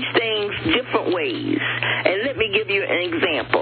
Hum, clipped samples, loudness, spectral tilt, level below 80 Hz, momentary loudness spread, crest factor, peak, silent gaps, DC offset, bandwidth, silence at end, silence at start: none; under 0.1%; -20 LUFS; -2 dB/octave; -52 dBFS; 3 LU; 20 dB; 0 dBFS; none; under 0.1%; 4.6 kHz; 0 s; 0 s